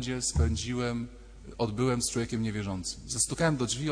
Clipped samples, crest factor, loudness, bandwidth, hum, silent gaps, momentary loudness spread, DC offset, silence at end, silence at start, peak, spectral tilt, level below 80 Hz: under 0.1%; 16 dB; -30 LUFS; 10.5 kHz; none; none; 9 LU; under 0.1%; 0 s; 0 s; -14 dBFS; -4.5 dB/octave; -40 dBFS